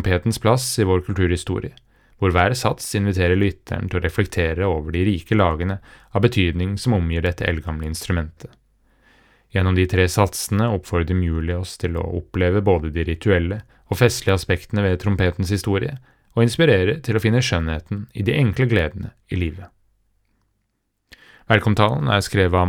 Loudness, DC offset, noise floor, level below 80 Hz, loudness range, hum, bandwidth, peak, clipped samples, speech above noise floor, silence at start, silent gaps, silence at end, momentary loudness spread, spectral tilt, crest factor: -20 LUFS; under 0.1%; -72 dBFS; -40 dBFS; 4 LU; none; 16.5 kHz; 0 dBFS; under 0.1%; 52 dB; 0 s; none; 0 s; 9 LU; -6 dB/octave; 20 dB